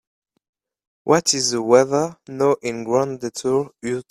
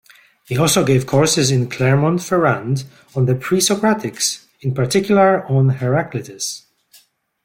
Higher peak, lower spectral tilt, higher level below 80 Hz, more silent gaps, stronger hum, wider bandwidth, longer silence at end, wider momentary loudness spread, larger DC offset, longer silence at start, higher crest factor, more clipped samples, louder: about the same, 0 dBFS vs -2 dBFS; second, -3.5 dB/octave vs -5 dB/octave; second, -62 dBFS vs -54 dBFS; neither; neither; about the same, 15 kHz vs 16.5 kHz; second, 0.1 s vs 0.85 s; about the same, 11 LU vs 11 LU; neither; first, 1.05 s vs 0.5 s; first, 20 dB vs 14 dB; neither; second, -20 LUFS vs -17 LUFS